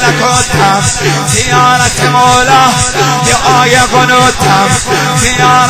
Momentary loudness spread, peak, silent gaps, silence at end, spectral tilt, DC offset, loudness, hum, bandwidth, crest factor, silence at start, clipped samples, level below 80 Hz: 3 LU; 0 dBFS; none; 0 s; -3 dB/octave; under 0.1%; -7 LUFS; none; 16 kHz; 8 dB; 0 s; 1%; -28 dBFS